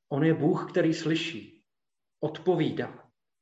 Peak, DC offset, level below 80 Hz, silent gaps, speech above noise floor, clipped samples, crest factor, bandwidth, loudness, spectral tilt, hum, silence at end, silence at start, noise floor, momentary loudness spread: -12 dBFS; under 0.1%; -74 dBFS; none; over 63 dB; under 0.1%; 16 dB; 8 kHz; -28 LUFS; -6.5 dB/octave; none; 0.45 s; 0.1 s; under -90 dBFS; 11 LU